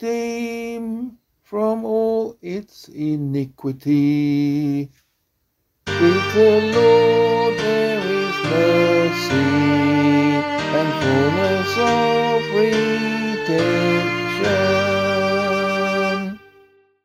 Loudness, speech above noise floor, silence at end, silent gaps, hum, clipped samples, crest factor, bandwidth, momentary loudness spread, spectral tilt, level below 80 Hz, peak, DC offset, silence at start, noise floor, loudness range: -18 LUFS; 52 dB; 0.7 s; none; none; under 0.1%; 16 dB; 15 kHz; 12 LU; -6 dB/octave; -56 dBFS; -2 dBFS; under 0.1%; 0 s; -70 dBFS; 6 LU